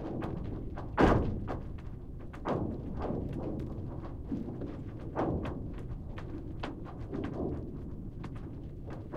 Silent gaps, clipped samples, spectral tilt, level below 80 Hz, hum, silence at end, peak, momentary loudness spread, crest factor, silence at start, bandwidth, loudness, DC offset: none; under 0.1%; -8.5 dB/octave; -42 dBFS; none; 0 s; -10 dBFS; 12 LU; 24 dB; 0 s; 10.5 kHz; -37 LUFS; under 0.1%